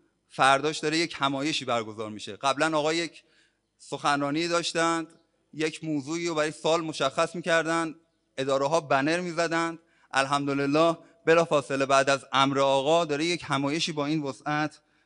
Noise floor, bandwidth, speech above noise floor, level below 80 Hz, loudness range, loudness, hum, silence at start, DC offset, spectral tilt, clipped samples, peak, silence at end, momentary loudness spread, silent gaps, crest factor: -66 dBFS; 11 kHz; 40 dB; -70 dBFS; 5 LU; -26 LUFS; none; 0.35 s; under 0.1%; -4 dB/octave; under 0.1%; -6 dBFS; 0.35 s; 10 LU; none; 20 dB